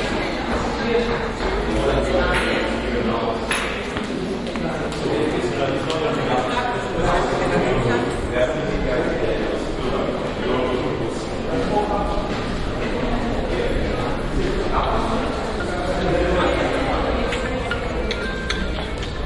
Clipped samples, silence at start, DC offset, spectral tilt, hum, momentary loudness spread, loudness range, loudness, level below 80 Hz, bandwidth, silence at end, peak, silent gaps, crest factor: under 0.1%; 0 s; under 0.1%; -5.5 dB/octave; none; 5 LU; 2 LU; -22 LUFS; -30 dBFS; 11.5 kHz; 0 s; -6 dBFS; none; 16 dB